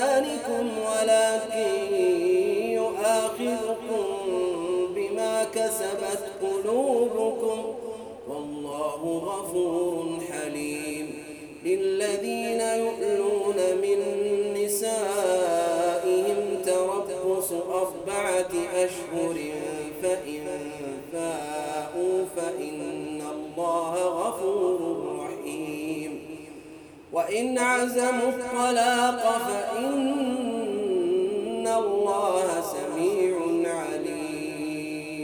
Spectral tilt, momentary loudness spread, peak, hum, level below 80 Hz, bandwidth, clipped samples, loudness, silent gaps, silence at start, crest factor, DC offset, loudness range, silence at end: -3.5 dB/octave; 10 LU; -8 dBFS; none; -66 dBFS; over 20 kHz; under 0.1%; -27 LUFS; none; 0 s; 18 dB; under 0.1%; 6 LU; 0 s